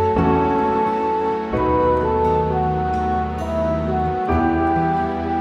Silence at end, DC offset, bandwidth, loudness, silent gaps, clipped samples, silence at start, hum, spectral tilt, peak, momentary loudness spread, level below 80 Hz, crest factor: 0 s; under 0.1%; 8 kHz; -19 LUFS; none; under 0.1%; 0 s; none; -8.5 dB/octave; -4 dBFS; 4 LU; -32 dBFS; 14 dB